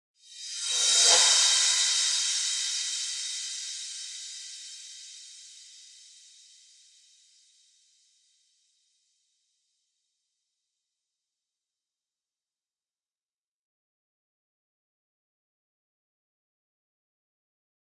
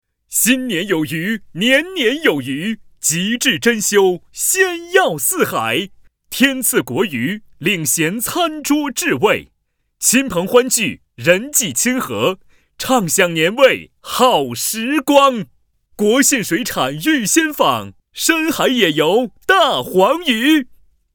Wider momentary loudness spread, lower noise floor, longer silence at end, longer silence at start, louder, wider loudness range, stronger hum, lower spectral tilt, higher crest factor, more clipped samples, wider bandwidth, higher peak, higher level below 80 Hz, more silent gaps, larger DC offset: first, 25 LU vs 8 LU; first, under -90 dBFS vs -67 dBFS; first, 12.15 s vs 0.5 s; about the same, 0.3 s vs 0.3 s; second, -23 LUFS vs -15 LUFS; first, 23 LU vs 2 LU; neither; second, 5.5 dB/octave vs -2.5 dB/octave; first, 26 dB vs 16 dB; neither; second, 11.5 kHz vs over 20 kHz; second, -8 dBFS vs 0 dBFS; second, under -90 dBFS vs -54 dBFS; neither; neither